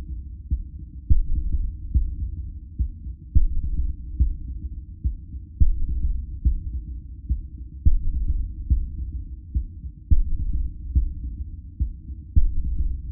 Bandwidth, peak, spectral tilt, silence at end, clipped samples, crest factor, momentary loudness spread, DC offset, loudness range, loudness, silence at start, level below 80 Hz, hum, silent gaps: 0.4 kHz; -4 dBFS; -18.5 dB/octave; 0 s; under 0.1%; 18 dB; 12 LU; under 0.1%; 2 LU; -29 LUFS; 0 s; -24 dBFS; none; none